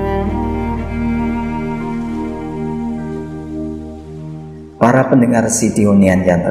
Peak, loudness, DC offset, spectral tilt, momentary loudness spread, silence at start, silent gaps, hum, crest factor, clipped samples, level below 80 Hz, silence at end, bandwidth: 0 dBFS; -16 LUFS; 0.4%; -6.5 dB/octave; 18 LU; 0 s; none; none; 16 dB; under 0.1%; -32 dBFS; 0 s; 15 kHz